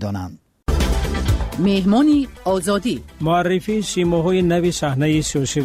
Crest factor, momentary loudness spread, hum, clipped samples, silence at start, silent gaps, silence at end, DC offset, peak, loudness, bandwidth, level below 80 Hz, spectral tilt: 10 dB; 9 LU; none; under 0.1%; 0 s; none; 0 s; under 0.1%; -8 dBFS; -19 LUFS; 16 kHz; -28 dBFS; -5.5 dB/octave